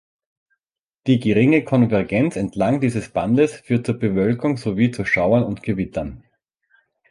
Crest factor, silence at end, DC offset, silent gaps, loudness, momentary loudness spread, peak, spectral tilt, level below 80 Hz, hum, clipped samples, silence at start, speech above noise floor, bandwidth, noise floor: 16 dB; 0.95 s; under 0.1%; none; -19 LUFS; 8 LU; -4 dBFS; -7.5 dB/octave; -48 dBFS; none; under 0.1%; 1.05 s; 65 dB; 11.5 kHz; -84 dBFS